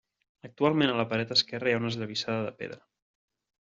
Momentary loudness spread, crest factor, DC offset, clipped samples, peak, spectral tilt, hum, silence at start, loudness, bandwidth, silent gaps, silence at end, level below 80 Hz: 10 LU; 22 dB; under 0.1%; under 0.1%; -10 dBFS; -3 dB/octave; none; 0.45 s; -28 LUFS; 7.8 kHz; none; 0.95 s; -70 dBFS